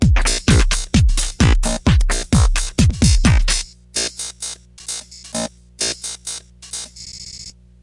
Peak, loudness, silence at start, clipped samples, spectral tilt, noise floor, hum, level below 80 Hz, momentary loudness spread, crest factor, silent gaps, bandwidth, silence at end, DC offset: -2 dBFS; -18 LUFS; 0 s; under 0.1%; -4 dB/octave; -38 dBFS; 60 Hz at -35 dBFS; -20 dBFS; 16 LU; 16 dB; none; 11.5 kHz; 0.35 s; under 0.1%